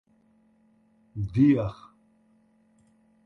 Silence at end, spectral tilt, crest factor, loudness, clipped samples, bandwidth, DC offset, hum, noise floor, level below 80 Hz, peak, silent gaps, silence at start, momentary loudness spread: 1.55 s; -10 dB/octave; 20 dB; -25 LUFS; under 0.1%; 6 kHz; under 0.1%; none; -64 dBFS; -54 dBFS; -10 dBFS; none; 1.15 s; 22 LU